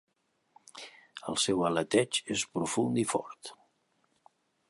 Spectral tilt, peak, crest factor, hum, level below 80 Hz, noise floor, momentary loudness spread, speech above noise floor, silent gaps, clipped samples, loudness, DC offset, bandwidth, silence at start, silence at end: -3.5 dB/octave; -10 dBFS; 22 dB; none; -68 dBFS; -74 dBFS; 19 LU; 43 dB; none; under 0.1%; -30 LUFS; under 0.1%; 11.5 kHz; 0.75 s; 1.15 s